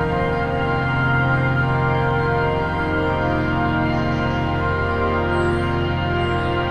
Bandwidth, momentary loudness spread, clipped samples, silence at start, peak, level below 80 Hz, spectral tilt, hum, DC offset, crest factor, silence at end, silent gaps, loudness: 9 kHz; 3 LU; under 0.1%; 0 s; -6 dBFS; -34 dBFS; -8 dB/octave; none; under 0.1%; 14 dB; 0 s; none; -20 LUFS